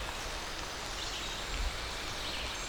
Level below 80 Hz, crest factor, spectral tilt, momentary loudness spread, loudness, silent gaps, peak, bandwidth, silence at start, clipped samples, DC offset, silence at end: -44 dBFS; 16 dB; -2 dB/octave; 2 LU; -37 LUFS; none; -22 dBFS; over 20 kHz; 0 s; under 0.1%; under 0.1%; 0 s